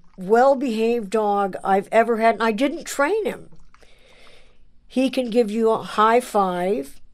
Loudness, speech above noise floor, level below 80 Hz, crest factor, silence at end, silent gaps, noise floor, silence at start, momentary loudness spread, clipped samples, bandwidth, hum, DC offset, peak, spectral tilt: -20 LUFS; 28 dB; -52 dBFS; 16 dB; 0 s; none; -47 dBFS; 0.05 s; 7 LU; under 0.1%; 15.5 kHz; none; under 0.1%; -4 dBFS; -5 dB/octave